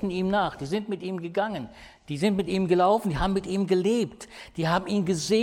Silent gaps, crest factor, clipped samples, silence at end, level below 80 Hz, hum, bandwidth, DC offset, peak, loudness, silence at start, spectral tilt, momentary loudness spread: none; 16 dB; under 0.1%; 0 s; -46 dBFS; none; 16 kHz; under 0.1%; -10 dBFS; -26 LUFS; 0 s; -6 dB/octave; 11 LU